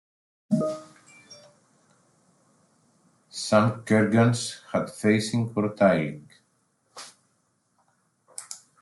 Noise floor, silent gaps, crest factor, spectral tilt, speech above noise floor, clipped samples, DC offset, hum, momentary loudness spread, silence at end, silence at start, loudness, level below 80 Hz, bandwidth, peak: -71 dBFS; none; 22 dB; -6 dB/octave; 48 dB; under 0.1%; under 0.1%; none; 22 LU; 0.25 s; 0.5 s; -24 LUFS; -68 dBFS; 12 kHz; -4 dBFS